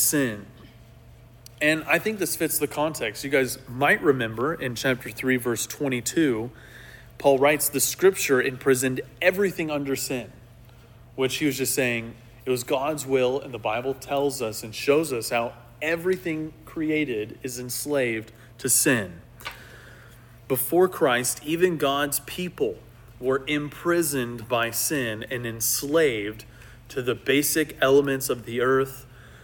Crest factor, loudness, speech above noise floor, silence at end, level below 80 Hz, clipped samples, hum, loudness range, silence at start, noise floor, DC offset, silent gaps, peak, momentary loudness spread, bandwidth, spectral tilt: 20 dB; -24 LUFS; 25 dB; 0 s; -56 dBFS; under 0.1%; none; 4 LU; 0 s; -49 dBFS; under 0.1%; none; -6 dBFS; 12 LU; 17.5 kHz; -3.5 dB/octave